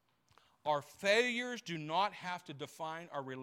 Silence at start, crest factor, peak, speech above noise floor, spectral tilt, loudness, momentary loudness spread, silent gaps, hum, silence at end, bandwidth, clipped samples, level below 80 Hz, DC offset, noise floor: 0.65 s; 20 dB; -18 dBFS; 33 dB; -3.5 dB/octave; -36 LUFS; 13 LU; none; none; 0 s; 16.5 kHz; under 0.1%; -84 dBFS; under 0.1%; -70 dBFS